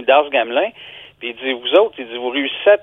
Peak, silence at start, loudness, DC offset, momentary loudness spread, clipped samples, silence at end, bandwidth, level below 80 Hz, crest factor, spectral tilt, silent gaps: 0 dBFS; 0 s; -17 LUFS; under 0.1%; 15 LU; under 0.1%; 0 s; 3.9 kHz; -64 dBFS; 16 dB; -5 dB/octave; none